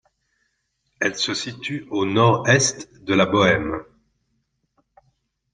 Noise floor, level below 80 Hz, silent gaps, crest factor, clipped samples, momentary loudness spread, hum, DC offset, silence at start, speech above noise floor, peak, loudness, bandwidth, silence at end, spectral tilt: -72 dBFS; -54 dBFS; none; 20 dB; under 0.1%; 13 LU; none; under 0.1%; 1 s; 52 dB; -2 dBFS; -20 LUFS; 10.5 kHz; 1.7 s; -4 dB/octave